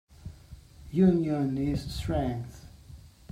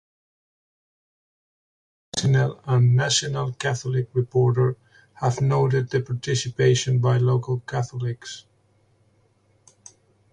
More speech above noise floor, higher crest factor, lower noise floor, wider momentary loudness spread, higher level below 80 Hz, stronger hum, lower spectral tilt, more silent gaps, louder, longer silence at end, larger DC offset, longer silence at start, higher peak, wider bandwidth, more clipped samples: second, 23 dB vs 41 dB; about the same, 18 dB vs 16 dB; second, -50 dBFS vs -62 dBFS; first, 24 LU vs 10 LU; first, -46 dBFS vs -56 dBFS; neither; first, -8 dB/octave vs -5.5 dB/octave; neither; second, -28 LUFS vs -22 LUFS; second, 0.25 s vs 1.95 s; neither; second, 0.25 s vs 2.15 s; second, -12 dBFS vs -8 dBFS; first, 14 kHz vs 9.8 kHz; neither